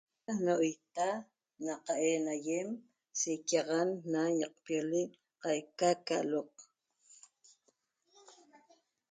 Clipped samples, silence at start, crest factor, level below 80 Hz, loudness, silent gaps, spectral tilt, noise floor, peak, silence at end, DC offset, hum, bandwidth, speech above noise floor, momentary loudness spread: under 0.1%; 0.3 s; 20 dB; -84 dBFS; -35 LUFS; none; -4 dB/octave; -77 dBFS; -16 dBFS; 0.8 s; under 0.1%; none; 9.6 kHz; 43 dB; 11 LU